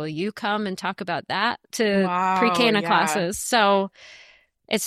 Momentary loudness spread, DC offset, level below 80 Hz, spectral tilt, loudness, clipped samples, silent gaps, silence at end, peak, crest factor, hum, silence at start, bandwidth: 9 LU; under 0.1%; -60 dBFS; -3.5 dB/octave; -22 LUFS; under 0.1%; none; 0 s; -6 dBFS; 18 dB; none; 0 s; 15.5 kHz